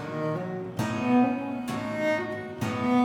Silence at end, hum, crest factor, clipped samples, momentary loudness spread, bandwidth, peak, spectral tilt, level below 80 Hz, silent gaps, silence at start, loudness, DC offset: 0 s; none; 16 dB; under 0.1%; 9 LU; 16.5 kHz; -12 dBFS; -6.5 dB/octave; -64 dBFS; none; 0 s; -28 LUFS; under 0.1%